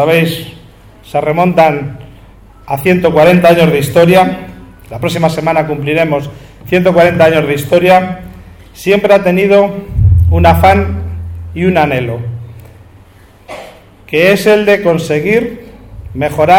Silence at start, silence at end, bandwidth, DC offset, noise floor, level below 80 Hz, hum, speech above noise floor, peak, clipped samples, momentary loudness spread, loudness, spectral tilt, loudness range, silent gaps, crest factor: 0 s; 0 s; 19 kHz; under 0.1%; -40 dBFS; -28 dBFS; none; 31 dB; 0 dBFS; 0.5%; 17 LU; -10 LUFS; -6.5 dB/octave; 4 LU; none; 10 dB